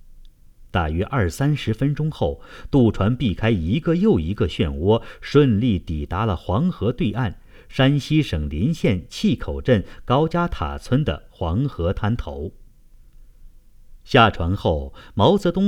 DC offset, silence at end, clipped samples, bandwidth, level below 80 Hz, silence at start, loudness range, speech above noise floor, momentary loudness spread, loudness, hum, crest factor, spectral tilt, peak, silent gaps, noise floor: under 0.1%; 0 s; under 0.1%; 14 kHz; -36 dBFS; 0.1 s; 4 LU; 27 dB; 9 LU; -21 LUFS; none; 18 dB; -7.5 dB/octave; -2 dBFS; none; -47 dBFS